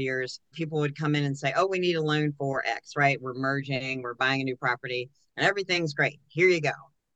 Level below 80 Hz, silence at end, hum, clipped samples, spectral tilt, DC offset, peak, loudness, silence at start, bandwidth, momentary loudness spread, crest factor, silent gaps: -72 dBFS; 0.35 s; none; under 0.1%; -5.5 dB/octave; under 0.1%; -8 dBFS; -27 LUFS; 0 s; 8.6 kHz; 8 LU; 20 dB; none